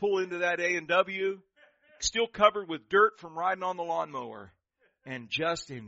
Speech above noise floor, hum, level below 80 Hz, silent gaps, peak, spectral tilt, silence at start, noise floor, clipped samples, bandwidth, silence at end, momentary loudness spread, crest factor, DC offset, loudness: 33 dB; none; -62 dBFS; none; -8 dBFS; -1.5 dB/octave; 0 s; -62 dBFS; under 0.1%; 8 kHz; 0 s; 16 LU; 22 dB; under 0.1%; -28 LUFS